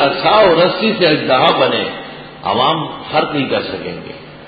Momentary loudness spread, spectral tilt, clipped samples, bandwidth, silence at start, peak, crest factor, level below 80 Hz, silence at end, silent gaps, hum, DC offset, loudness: 16 LU; -8 dB/octave; under 0.1%; 5 kHz; 0 s; 0 dBFS; 14 dB; -48 dBFS; 0 s; none; none; under 0.1%; -14 LUFS